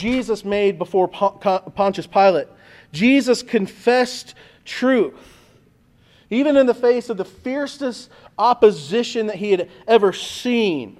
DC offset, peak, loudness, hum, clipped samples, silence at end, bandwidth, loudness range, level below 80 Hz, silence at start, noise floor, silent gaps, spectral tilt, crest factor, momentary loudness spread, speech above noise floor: under 0.1%; -2 dBFS; -19 LUFS; none; under 0.1%; 0.1 s; 14 kHz; 3 LU; -56 dBFS; 0 s; -55 dBFS; none; -5 dB/octave; 18 dB; 11 LU; 36 dB